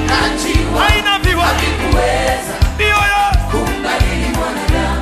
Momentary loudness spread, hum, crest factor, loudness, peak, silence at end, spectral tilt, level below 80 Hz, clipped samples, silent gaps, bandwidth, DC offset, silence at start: 5 LU; none; 12 dB; -14 LUFS; 0 dBFS; 0 s; -4.5 dB/octave; -20 dBFS; under 0.1%; none; 13.5 kHz; under 0.1%; 0 s